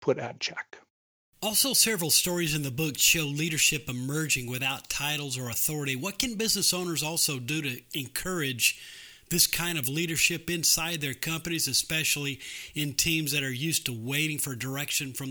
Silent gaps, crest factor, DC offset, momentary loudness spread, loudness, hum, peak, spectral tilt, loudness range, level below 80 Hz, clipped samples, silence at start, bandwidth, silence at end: 0.90-1.33 s; 22 dB; under 0.1%; 10 LU; -26 LUFS; none; -6 dBFS; -2 dB/octave; 3 LU; -56 dBFS; under 0.1%; 0 s; over 20 kHz; 0 s